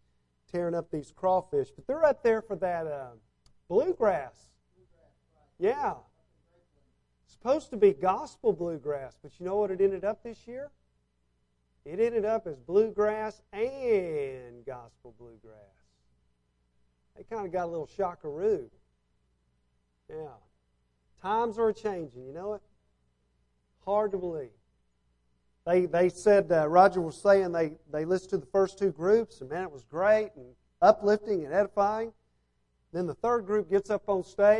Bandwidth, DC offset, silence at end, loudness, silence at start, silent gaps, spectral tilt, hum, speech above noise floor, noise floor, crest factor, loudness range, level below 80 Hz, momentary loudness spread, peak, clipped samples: 10.5 kHz; under 0.1%; 0 s; -28 LUFS; 0.55 s; none; -6.5 dB/octave; 60 Hz at -60 dBFS; 45 dB; -73 dBFS; 24 dB; 11 LU; -62 dBFS; 17 LU; -6 dBFS; under 0.1%